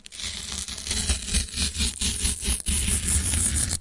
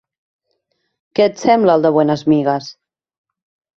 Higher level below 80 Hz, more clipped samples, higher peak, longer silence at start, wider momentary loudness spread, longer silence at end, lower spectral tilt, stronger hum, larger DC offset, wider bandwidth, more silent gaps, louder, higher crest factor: first, -32 dBFS vs -60 dBFS; neither; second, -6 dBFS vs -2 dBFS; second, 0.1 s vs 1.15 s; about the same, 9 LU vs 11 LU; second, 0 s vs 1.05 s; second, -2 dB/octave vs -6.5 dB/octave; neither; neither; first, 11.5 kHz vs 7.6 kHz; neither; second, -24 LUFS vs -15 LUFS; about the same, 20 dB vs 16 dB